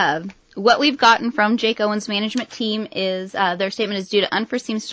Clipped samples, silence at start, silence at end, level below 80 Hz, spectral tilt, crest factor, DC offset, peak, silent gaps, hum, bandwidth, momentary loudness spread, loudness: under 0.1%; 0 s; 0 s; -62 dBFS; -4 dB/octave; 18 dB; under 0.1%; -2 dBFS; none; none; 8 kHz; 9 LU; -19 LUFS